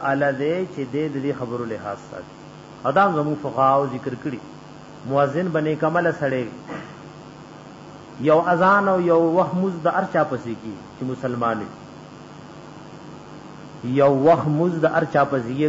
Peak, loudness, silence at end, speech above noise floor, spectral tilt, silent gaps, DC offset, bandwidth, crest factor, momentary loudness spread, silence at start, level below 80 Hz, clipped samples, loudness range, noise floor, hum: -6 dBFS; -21 LUFS; 0 s; 20 dB; -7.5 dB/octave; none; under 0.1%; 8 kHz; 16 dB; 23 LU; 0 s; -60 dBFS; under 0.1%; 6 LU; -40 dBFS; none